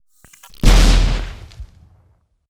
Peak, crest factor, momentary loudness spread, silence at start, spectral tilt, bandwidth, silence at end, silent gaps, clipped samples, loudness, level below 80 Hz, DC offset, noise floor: 0 dBFS; 16 dB; 23 LU; 0.65 s; -4.5 dB/octave; 13.5 kHz; 0.85 s; none; under 0.1%; -16 LUFS; -16 dBFS; under 0.1%; -57 dBFS